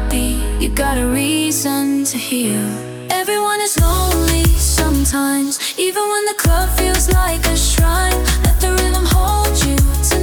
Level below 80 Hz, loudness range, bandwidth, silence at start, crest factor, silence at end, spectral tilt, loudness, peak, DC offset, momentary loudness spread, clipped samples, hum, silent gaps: -18 dBFS; 2 LU; over 20 kHz; 0 s; 14 dB; 0 s; -4 dB/octave; -15 LUFS; 0 dBFS; under 0.1%; 4 LU; under 0.1%; none; none